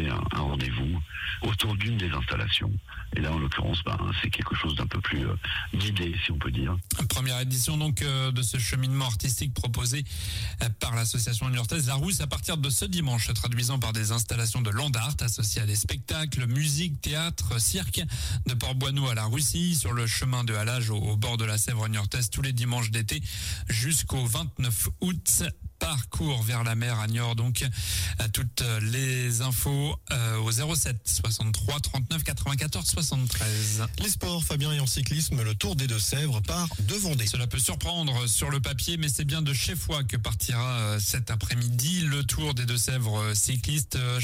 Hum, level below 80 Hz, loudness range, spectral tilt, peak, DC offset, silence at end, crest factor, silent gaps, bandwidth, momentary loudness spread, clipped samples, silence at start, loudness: none; -40 dBFS; 2 LU; -3.5 dB/octave; -12 dBFS; under 0.1%; 0 s; 16 dB; none; 16.5 kHz; 4 LU; under 0.1%; 0 s; -27 LUFS